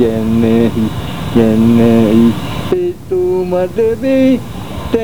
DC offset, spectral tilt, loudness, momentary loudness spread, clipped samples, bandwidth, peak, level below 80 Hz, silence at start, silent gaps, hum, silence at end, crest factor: 3%; -7.5 dB/octave; -12 LUFS; 9 LU; 0.2%; 20 kHz; 0 dBFS; -34 dBFS; 0 s; none; none; 0 s; 12 dB